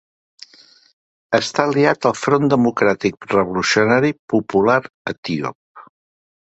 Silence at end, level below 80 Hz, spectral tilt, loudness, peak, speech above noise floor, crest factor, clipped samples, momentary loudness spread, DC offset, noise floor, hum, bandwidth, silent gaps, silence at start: 0.75 s; -56 dBFS; -5 dB/octave; -17 LUFS; 0 dBFS; 33 dB; 18 dB; under 0.1%; 9 LU; under 0.1%; -50 dBFS; none; 8.2 kHz; 4.19-4.28 s, 4.94-5.05 s, 5.18-5.23 s, 5.55-5.75 s; 1.3 s